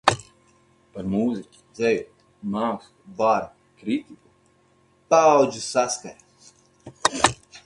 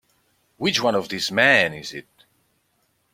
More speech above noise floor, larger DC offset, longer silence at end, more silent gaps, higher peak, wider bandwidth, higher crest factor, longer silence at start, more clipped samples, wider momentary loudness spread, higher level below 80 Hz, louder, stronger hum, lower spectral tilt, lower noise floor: second, 38 dB vs 47 dB; neither; second, 0.1 s vs 1.1 s; neither; about the same, 0 dBFS vs -2 dBFS; second, 11.5 kHz vs 16.5 kHz; about the same, 24 dB vs 22 dB; second, 0.05 s vs 0.6 s; neither; about the same, 21 LU vs 19 LU; first, -56 dBFS vs -62 dBFS; second, -23 LUFS vs -19 LUFS; neither; about the same, -3.5 dB/octave vs -3 dB/octave; second, -61 dBFS vs -68 dBFS